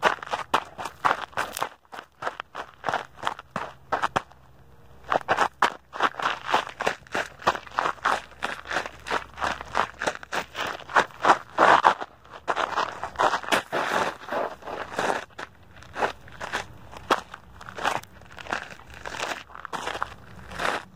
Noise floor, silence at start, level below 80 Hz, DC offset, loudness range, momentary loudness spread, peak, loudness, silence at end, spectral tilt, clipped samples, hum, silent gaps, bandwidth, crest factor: -53 dBFS; 0 s; -56 dBFS; 0.2%; 9 LU; 15 LU; 0 dBFS; -27 LUFS; 0.1 s; -2.5 dB/octave; under 0.1%; none; none; 16 kHz; 28 dB